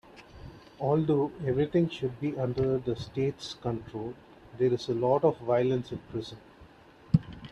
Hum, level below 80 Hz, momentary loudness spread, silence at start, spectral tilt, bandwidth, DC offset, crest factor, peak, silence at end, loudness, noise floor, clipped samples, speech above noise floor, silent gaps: none; -56 dBFS; 17 LU; 0.15 s; -8 dB/octave; 10 kHz; under 0.1%; 22 dB; -8 dBFS; 0 s; -30 LUFS; -54 dBFS; under 0.1%; 25 dB; none